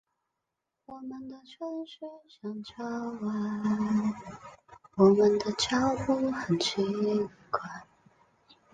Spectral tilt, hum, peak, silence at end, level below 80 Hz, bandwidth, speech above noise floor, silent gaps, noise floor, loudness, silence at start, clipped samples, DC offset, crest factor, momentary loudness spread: -5.5 dB/octave; none; -10 dBFS; 0.9 s; -64 dBFS; 9.4 kHz; 56 dB; none; -85 dBFS; -29 LUFS; 0.9 s; under 0.1%; under 0.1%; 22 dB; 20 LU